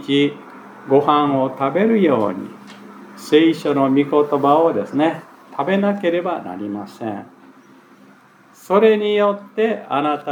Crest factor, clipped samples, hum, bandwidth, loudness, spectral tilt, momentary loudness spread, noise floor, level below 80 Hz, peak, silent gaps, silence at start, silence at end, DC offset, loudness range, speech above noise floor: 18 dB; under 0.1%; none; 16.5 kHz; -18 LUFS; -7 dB/octave; 19 LU; -48 dBFS; -80 dBFS; -2 dBFS; none; 0 s; 0 s; under 0.1%; 6 LU; 31 dB